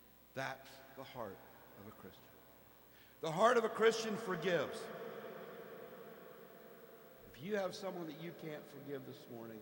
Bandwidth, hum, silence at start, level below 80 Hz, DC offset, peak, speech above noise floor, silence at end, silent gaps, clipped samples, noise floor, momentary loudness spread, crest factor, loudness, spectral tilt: 18.5 kHz; none; 0 s; -78 dBFS; under 0.1%; -16 dBFS; 23 dB; 0 s; none; under 0.1%; -63 dBFS; 24 LU; 26 dB; -40 LUFS; -4.5 dB/octave